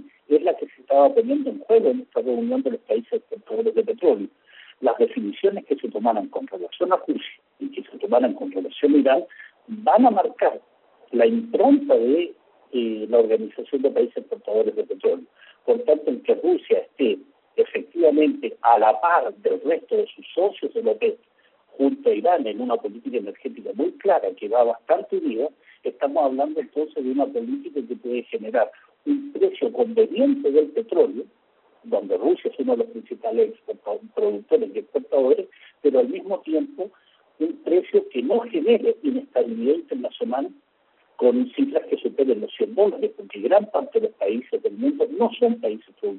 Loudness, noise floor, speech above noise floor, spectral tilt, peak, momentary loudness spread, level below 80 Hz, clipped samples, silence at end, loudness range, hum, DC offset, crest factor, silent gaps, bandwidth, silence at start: -22 LUFS; -63 dBFS; 41 dB; -4 dB/octave; -4 dBFS; 11 LU; -74 dBFS; under 0.1%; 0 s; 4 LU; none; under 0.1%; 18 dB; none; 4.2 kHz; 0 s